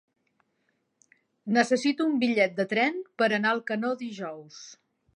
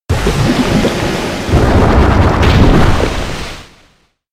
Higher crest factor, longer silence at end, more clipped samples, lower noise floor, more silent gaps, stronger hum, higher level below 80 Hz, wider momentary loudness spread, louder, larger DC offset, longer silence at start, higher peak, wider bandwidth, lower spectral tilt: first, 20 dB vs 10 dB; second, 0.45 s vs 0.7 s; neither; first, -75 dBFS vs -51 dBFS; neither; neither; second, -80 dBFS vs -16 dBFS; first, 19 LU vs 11 LU; second, -26 LUFS vs -12 LUFS; neither; first, 1.45 s vs 0.1 s; second, -8 dBFS vs 0 dBFS; second, 10.5 kHz vs 15.5 kHz; second, -4.5 dB/octave vs -6 dB/octave